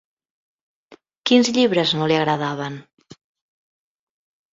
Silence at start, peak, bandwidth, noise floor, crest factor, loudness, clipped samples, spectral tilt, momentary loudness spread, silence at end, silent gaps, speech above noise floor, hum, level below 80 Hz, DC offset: 0.9 s; -2 dBFS; 7.8 kHz; -52 dBFS; 20 dB; -19 LUFS; under 0.1%; -4.5 dB/octave; 13 LU; 1.7 s; 1.17-1.22 s; 34 dB; none; -64 dBFS; under 0.1%